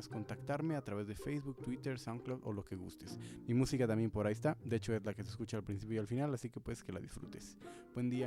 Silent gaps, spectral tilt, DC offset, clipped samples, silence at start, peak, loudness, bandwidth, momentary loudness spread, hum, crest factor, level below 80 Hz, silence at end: none; -7 dB/octave; under 0.1%; under 0.1%; 0 s; -22 dBFS; -41 LUFS; 15 kHz; 14 LU; none; 18 dB; -62 dBFS; 0 s